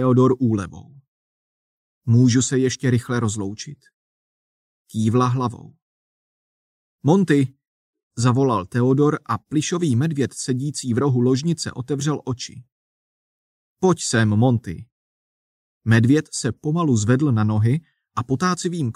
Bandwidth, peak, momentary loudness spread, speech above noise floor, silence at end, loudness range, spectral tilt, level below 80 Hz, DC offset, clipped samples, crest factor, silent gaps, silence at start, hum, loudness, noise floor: 11.5 kHz; -4 dBFS; 13 LU; over 71 dB; 0.05 s; 4 LU; -6 dB/octave; -56 dBFS; under 0.1%; under 0.1%; 18 dB; 1.08-2.01 s, 3.94-4.85 s, 5.82-6.99 s, 7.68-7.93 s, 8.03-8.11 s, 12.72-13.76 s, 14.92-15.81 s; 0 s; none; -20 LUFS; under -90 dBFS